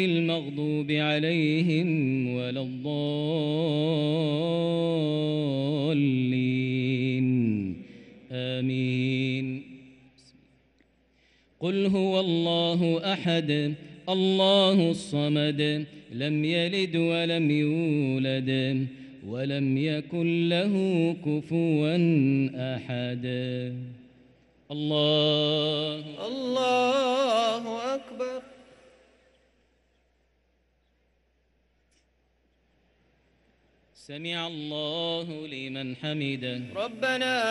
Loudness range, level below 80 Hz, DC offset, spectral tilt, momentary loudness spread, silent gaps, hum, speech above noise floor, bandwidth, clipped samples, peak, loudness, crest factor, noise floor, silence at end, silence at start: 8 LU; -70 dBFS; under 0.1%; -6.5 dB/octave; 10 LU; none; none; 43 dB; 11.5 kHz; under 0.1%; -10 dBFS; -27 LUFS; 16 dB; -70 dBFS; 0 s; 0 s